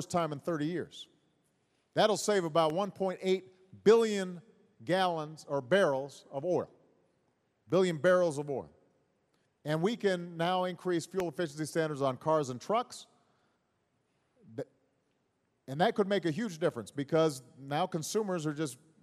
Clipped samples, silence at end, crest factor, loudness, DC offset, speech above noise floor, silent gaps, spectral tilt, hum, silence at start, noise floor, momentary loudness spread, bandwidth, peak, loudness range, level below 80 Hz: under 0.1%; 0.3 s; 22 dB; -32 LUFS; under 0.1%; 46 dB; none; -5 dB/octave; none; 0 s; -77 dBFS; 15 LU; 13.5 kHz; -12 dBFS; 6 LU; -76 dBFS